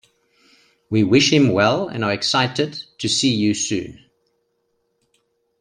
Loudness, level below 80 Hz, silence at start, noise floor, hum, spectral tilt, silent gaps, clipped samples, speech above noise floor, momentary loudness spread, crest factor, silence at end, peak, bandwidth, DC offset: -18 LUFS; -58 dBFS; 0.9 s; -69 dBFS; none; -4 dB/octave; none; under 0.1%; 51 dB; 11 LU; 18 dB; 1.65 s; -2 dBFS; 11 kHz; under 0.1%